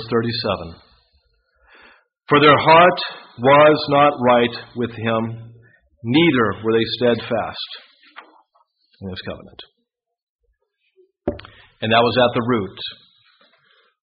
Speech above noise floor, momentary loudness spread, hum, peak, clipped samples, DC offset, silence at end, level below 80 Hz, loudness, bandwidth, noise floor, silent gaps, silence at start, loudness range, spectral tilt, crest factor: 58 dB; 20 LU; none; 0 dBFS; under 0.1%; under 0.1%; 1.1 s; -52 dBFS; -17 LUFS; 5.2 kHz; -75 dBFS; 10.22-10.39 s; 0 s; 20 LU; -3.5 dB/octave; 20 dB